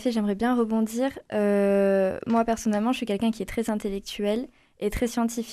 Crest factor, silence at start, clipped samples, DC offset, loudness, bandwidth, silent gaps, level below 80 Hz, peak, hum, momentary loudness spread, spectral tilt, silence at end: 14 dB; 0 s; under 0.1%; under 0.1%; -26 LUFS; 14.5 kHz; none; -48 dBFS; -12 dBFS; none; 8 LU; -5.5 dB/octave; 0 s